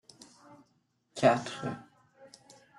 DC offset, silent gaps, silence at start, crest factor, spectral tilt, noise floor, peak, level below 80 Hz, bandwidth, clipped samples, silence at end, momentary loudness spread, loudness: under 0.1%; none; 0.5 s; 24 dB; -5.5 dB/octave; -73 dBFS; -10 dBFS; -72 dBFS; 12 kHz; under 0.1%; 0.55 s; 21 LU; -30 LUFS